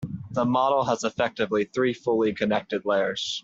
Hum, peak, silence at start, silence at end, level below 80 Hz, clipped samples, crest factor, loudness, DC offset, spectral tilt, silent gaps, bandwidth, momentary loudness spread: none; -10 dBFS; 0 s; 0.05 s; -62 dBFS; under 0.1%; 16 dB; -25 LUFS; under 0.1%; -5 dB/octave; none; 8 kHz; 4 LU